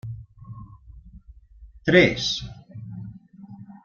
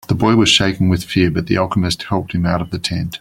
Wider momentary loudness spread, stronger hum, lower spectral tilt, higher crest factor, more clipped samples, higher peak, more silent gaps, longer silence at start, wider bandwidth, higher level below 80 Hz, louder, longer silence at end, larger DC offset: first, 26 LU vs 9 LU; neither; about the same, -5 dB/octave vs -5 dB/octave; first, 24 dB vs 16 dB; neither; about the same, -2 dBFS vs 0 dBFS; neither; about the same, 0.05 s vs 0.1 s; second, 7.2 kHz vs 16.5 kHz; second, -48 dBFS vs -40 dBFS; second, -20 LUFS vs -16 LUFS; about the same, 0.1 s vs 0.05 s; neither